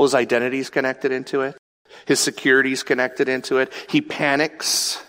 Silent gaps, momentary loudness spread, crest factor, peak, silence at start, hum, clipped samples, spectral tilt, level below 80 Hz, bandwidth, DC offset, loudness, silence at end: 1.59-1.85 s; 7 LU; 18 dB; -4 dBFS; 0 s; none; under 0.1%; -2.5 dB/octave; -68 dBFS; 16 kHz; under 0.1%; -20 LUFS; 0.05 s